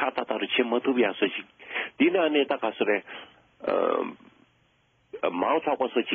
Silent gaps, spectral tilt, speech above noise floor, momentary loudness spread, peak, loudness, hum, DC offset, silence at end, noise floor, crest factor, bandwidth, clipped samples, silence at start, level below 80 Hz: none; -1.5 dB/octave; 41 dB; 12 LU; -10 dBFS; -26 LUFS; none; under 0.1%; 0 s; -66 dBFS; 16 dB; 4.6 kHz; under 0.1%; 0 s; -74 dBFS